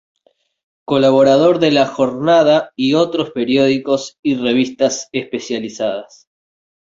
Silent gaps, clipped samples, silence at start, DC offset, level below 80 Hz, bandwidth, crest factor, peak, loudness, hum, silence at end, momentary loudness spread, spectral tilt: 4.19-4.23 s; under 0.1%; 0.9 s; under 0.1%; -58 dBFS; 7.8 kHz; 14 dB; 0 dBFS; -15 LUFS; none; 0.8 s; 11 LU; -5 dB/octave